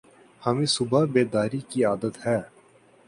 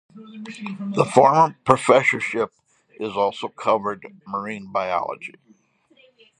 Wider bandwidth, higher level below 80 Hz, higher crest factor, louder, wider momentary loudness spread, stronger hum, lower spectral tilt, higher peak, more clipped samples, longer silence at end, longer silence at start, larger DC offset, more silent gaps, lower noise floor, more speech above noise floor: about the same, 11.5 kHz vs 10.5 kHz; about the same, -62 dBFS vs -64 dBFS; about the same, 18 dB vs 22 dB; second, -25 LUFS vs -21 LUFS; second, 6 LU vs 19 LU; neither; about the same, -5.5 dB/octave vs -5.5 dB/octave; second, -6 dBFS vs 0 dBFS; neither; second, 0.6 s vs 1.1 s; first, 0.4 s vs 0.15 s; neither; neither; about the same, -56 dBFS vs -59 dBFS; second, 32 dB vs 38 dB